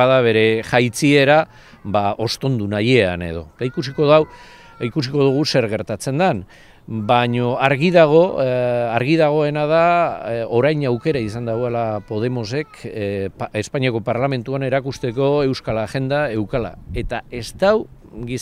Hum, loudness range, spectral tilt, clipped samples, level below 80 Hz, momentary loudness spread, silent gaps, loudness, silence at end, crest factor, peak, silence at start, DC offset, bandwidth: none; 6 LU; -6 dB/octave; under 0.1%; -44 dBFS; 12 LU; none; -18 LUFS; 0 s; 18 dB; 0 dBFS; 0 s; under 0.1%; 14.5 kHz